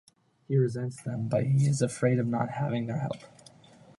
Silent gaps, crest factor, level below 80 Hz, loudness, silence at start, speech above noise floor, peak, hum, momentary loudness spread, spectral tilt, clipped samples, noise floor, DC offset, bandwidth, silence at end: none; 16 dB; -66 dBFS; -29 LUFS; 0.5 s; 28 dB; -12 dBFS; none; 9 LU; -7 dB/octave; under 0.1%; -55 dBFS; under 0.1%; 11.5 kHz; 0.7 s